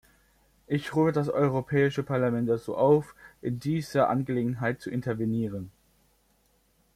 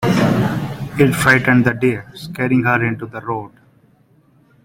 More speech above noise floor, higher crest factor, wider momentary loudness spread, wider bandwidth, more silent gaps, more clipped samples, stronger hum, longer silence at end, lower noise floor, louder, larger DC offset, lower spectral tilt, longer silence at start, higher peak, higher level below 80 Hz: about the same, 40 dB vs 38 dB; about the same, 18 dB vs 16 dB; second, 10 LU vs 14 LU; about the same, 15 kHz vs 16.5 kHz; neither; neither; neither; about the same, 1.25 s vs 1.15 s; first, -67 dBFS vs -54 dBFS; second, -27 LUFS vs -16 LUFS; neither; first, -8 dB/octave vs -6.5 dB/octave; first, 0.7 s vs 0 s; second, -10 dBFS vs 0 dBFS; second, -60 dBFS vs -46 dBFS